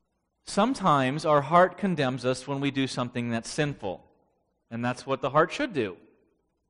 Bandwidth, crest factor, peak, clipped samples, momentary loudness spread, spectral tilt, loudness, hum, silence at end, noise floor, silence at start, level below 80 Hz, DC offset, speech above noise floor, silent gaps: 10.5 kHz; 22 dB; -6 dBFS; under 0.1%; 12 LU; -5.5 dB/octave; -26 LUFS; none; 0.75 s; -72 dBFS; 0.45 s; -60 dBFS; under 0.1%; 46 dB; none